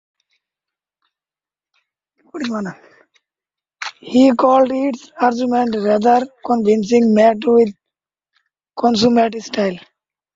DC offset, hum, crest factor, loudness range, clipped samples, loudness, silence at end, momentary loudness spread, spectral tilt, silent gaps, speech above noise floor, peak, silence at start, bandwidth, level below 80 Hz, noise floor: under 0.1%; none; 16 dB; 17 LU; under 0.1%; -16 LUFS; 0.55 s; 16 LU; -5.5 dB/octave; none; over 75 dB; -2 dBFS; 2.35 s; 7.8 kHz; -60 dBFS; under -90 dBFS